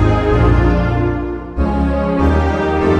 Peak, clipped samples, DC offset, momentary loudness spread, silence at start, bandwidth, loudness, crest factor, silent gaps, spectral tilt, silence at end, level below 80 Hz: -2 dBFS; under 0.1%; under 0.1%; 7 LU; 0 s; 7.8 kHz; -15 LUFS; 12 dB; none; -8.5 dB/octave; 0 s; -20 dBFS